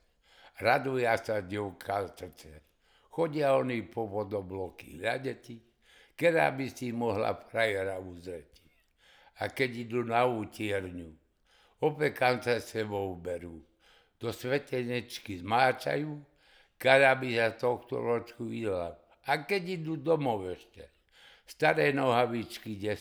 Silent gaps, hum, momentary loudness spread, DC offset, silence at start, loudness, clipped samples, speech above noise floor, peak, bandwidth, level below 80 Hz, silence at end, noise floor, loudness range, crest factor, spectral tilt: none; none; 16 LU; under 0.1%; 0.45 s; -31 LUFS; under 0.1%; 36 dB; -6 dBFS; over 20 kHz; -66 dBFS; 0 s; -66 dBFS; 6 LU; 26 dB; -5.5 dB/octave